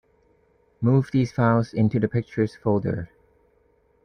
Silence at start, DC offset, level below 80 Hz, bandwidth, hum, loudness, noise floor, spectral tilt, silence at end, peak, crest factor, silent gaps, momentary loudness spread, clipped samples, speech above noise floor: 0.8 s; under 0.1%; -54 dBFS; 9.6 kHz; none; -23 LUFS; -63 dBFS; -9 dB/octave; 1 s; -8 dBFS; 18 dB; none; 7 LU; under 0.1%; 41 dB